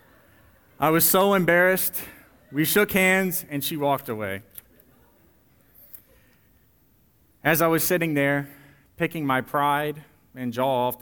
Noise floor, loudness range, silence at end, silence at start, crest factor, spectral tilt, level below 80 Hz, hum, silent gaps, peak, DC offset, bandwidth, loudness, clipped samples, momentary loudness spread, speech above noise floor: -61 dBFS; 11 LU; 0.05 s; 0.8 s; 20 dB; -4 dB/octave; -60 dBFS; none; none; -6 dBFS; under 0.1%; over 20 kHz; -22 LUFS; under 0.1%; 14 LU; 39 dB